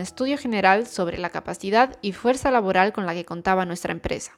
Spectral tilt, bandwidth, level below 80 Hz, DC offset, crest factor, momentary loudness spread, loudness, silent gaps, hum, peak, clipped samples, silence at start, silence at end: -5 dB/octave; 15 kHz; -50 dBFS; under 0.1%; 20 dB; 10 LU; -23 LUFS; none; none; -2 dBFS; under 0.1%; 0 s; 0.1 s